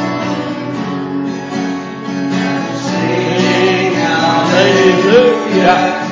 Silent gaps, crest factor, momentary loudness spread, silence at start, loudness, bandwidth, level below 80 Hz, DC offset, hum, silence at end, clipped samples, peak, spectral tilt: none; 12 dB; 11 LU; 0 s; -13 LUFS; 7.8 kHz; -52 dBFS; under 0.1%; none; 0 s; under 0.1%; 0 dBFS; -5.5 dB/octave